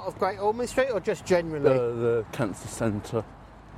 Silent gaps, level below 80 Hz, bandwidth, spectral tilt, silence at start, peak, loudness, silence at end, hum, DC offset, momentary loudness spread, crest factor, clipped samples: none; -52 dBFS; 15.5 kHz; -6 dB/octave; 0 s; -8 dBFS; -27 LUFS; 0 s; none; under 0.1%; 8 LU; 20 dB; under 0.1%